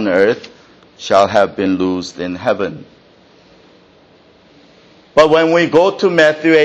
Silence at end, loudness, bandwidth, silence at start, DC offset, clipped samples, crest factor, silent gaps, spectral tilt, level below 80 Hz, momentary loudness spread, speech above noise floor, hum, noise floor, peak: 0 s; -13 LUFS; 8.8 kHz; 0 s; under 0.1%; under 0.1%; 14 dB; none; -5 dB/octave; -52 dBFS; 13 LU; 35 dB; none; -47 dBFS; 0 dBFS